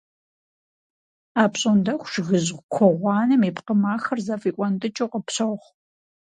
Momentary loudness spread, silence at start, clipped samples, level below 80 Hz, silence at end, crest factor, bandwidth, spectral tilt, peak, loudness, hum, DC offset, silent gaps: 8 LU; 1.35 s; under 0.1%; -66 dBFS; 0.7 s; 20 dB; 9.4 kHz; -5.5 dB/octave; -4 dBFS; -22 LUFS; none; under 0.1%; 2.63-2.69 s